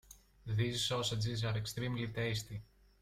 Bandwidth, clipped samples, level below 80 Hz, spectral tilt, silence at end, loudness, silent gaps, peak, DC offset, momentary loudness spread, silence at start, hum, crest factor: 15.5 kHz; under 0.1%; -60 dBFS; -4.5 dB/octave; 0.35 s; -37 LUFS; none; -22 dBFS; under 0.1%; 11 LU; 0.1 s; none; 16 dB